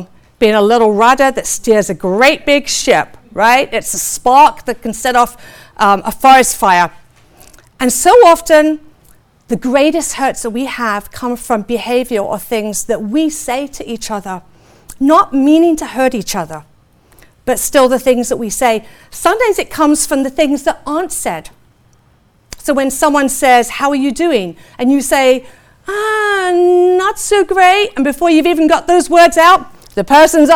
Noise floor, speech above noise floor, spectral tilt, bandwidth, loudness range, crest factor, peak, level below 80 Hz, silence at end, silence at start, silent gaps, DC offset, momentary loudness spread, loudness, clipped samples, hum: -51 dBFS; 39 dB; -3 dB/octave; 20 kHz; 7 LU; 12 dB; 0 dBFS; -40 dBFS; 0 s; 0 s; none; under 0.1%; 13 LU; -12 LUFS; under 0.1%; none